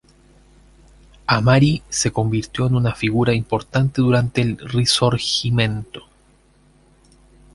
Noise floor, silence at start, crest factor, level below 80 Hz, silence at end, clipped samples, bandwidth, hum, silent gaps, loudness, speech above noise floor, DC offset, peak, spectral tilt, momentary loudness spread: -55 dBFS; 1.3 s; 18 dB; -44 dBFS; 1.55 s; under 0.1%; 11.5 kHz; none; none; -19 LUFS; 37 dB; under 0.1%; -2 dBFS; -5 dB/octave; 6 LU